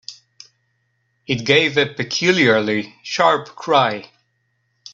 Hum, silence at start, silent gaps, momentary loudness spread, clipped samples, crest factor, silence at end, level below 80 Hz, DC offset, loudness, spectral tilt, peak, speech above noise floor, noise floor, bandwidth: none; 0.1 s; none; 10 LU; under 0.1%; 20 dB; 0.9 s; -60 dBFS; under 0.1%; -17 LUFS; -4 dB/octave; 0 dBFS; 50 dB; -68 dBFS; 8 kHz